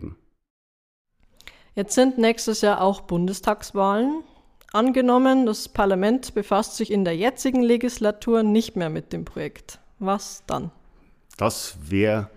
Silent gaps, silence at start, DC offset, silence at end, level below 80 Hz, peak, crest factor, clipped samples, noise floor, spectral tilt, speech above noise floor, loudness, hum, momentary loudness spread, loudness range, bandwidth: 0.50-1.05 s; 0 s; under 0.1%; 0.1 s; -48 dBFS; -4 dBFS; 18 dB; under 0.1%; -54 dBFS; -5 dB/octave; 32 dB; -22 LUFS; none; 12 LU; 6 LU; 15.5 kHz